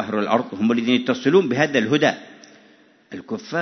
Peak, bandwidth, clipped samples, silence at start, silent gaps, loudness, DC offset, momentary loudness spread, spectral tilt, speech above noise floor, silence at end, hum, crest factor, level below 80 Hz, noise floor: -4 dBFS; 6.4 kHz; under 0.1%; 0 s; none; -19 LUFS; under 0.1%; 15 LU; -5.5 dB/octave; 34 dB; 0 s; none; 18 dB; -66 dBFS; -53 dBFS